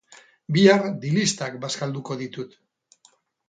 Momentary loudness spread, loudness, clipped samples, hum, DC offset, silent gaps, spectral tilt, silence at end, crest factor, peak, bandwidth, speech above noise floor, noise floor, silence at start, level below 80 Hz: 17 LU; -22 LUFS; under 0.1%; none; under 0.1%; none; -5 dB/octave; 1 s; 22 dB; -2 dBFS; 9.4 kHz; 39 dB; -61 dBFS; 0.5 s; -66 dBFS